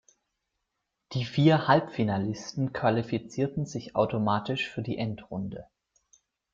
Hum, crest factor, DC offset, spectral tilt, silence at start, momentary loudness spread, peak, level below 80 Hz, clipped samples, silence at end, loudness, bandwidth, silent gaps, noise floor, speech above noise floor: none; 22 dB; under 0.1%; -6.5 dB/octave; 1.1 s; 13 LU; -8 dBFS; -62 dBFS; under 0.1%; 0.9 s; -28 LUFS; 7.6 kHz; none; -82 dBFS; 55 dB